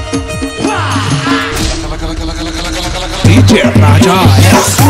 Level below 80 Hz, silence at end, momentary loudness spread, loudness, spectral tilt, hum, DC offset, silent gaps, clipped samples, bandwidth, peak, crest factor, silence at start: -22 dBFS; 0 s; 12 LU; -10 LUFS; -5 dB/octave; none; under 0.1%; none; 0.5%; 16.5 kHz; 0 dBFS; 8 dB; 0 s